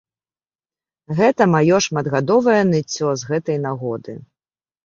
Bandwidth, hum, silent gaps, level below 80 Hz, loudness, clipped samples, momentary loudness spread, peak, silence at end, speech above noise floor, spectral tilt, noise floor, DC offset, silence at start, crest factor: 7.6 kHz; none; none; -58 dBFS; -18 LUFS; under 0.1%; 12 LU; -2 dBFS; 0.65 s; over 73 dB; -5.5 dB/octave; under -90 dBFS; under 0.1%; 1.1 s; 18 dB